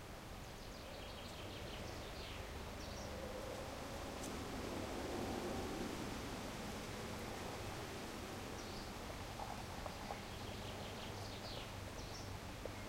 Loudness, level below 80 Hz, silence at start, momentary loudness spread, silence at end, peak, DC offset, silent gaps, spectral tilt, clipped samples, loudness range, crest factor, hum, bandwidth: -47 LUFS; -56 dBFS; 0 s; 5 LU; 0 s; -30 dBFS; under 0.1%; none; -4.5 dB/octave; under 0.1%; 3 LU; 16 dB; none; 16 kHz